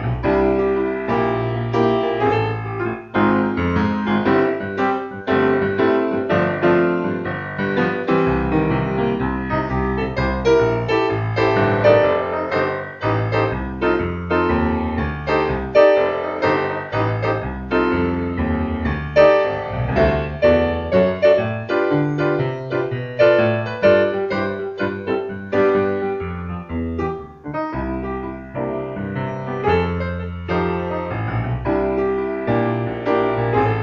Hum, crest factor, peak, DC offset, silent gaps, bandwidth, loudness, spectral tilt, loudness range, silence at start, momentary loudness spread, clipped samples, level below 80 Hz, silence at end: none; 18 dB; 0 dBFS; under 0.1%; none; 7 kHz; -19 LUFS; -8.5 dB/octave; 5 LU; 0 s; 9 LU; under 0.1%; -36 dBFS; 0 s